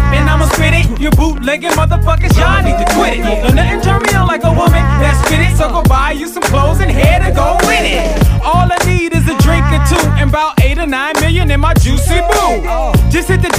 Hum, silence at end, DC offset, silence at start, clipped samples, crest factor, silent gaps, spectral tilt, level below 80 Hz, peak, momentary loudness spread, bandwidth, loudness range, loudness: none; 0 s; under 0.1%; 0 s; under 0.1%; 10 dB; none; -5.5 dB/octave; -14 dBFS; 0 dBFS; 3 LU; 16 kHz; 1 LU; -11 LUFS